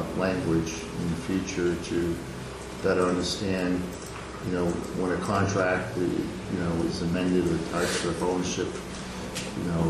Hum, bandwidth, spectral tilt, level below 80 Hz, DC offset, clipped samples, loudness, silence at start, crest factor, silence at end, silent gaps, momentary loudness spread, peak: none; 14 kHz; -5.5 dB/octave; -46 dBFS; under 0.1%; under 0.1%; -28 LUFS; 0 s; 16 dB; 0 s; none; 10 LU; -12 dBFS